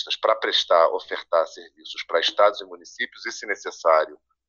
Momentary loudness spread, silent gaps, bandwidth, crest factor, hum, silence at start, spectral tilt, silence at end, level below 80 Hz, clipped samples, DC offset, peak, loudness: 15 LU; none; 7.2 kHz; 20 dB; none; 0 s; 0 dB/octave; 0.35 s; -74 dBFS; under 0.1%; under 0.1%; -4 dBFS; -22 LUFS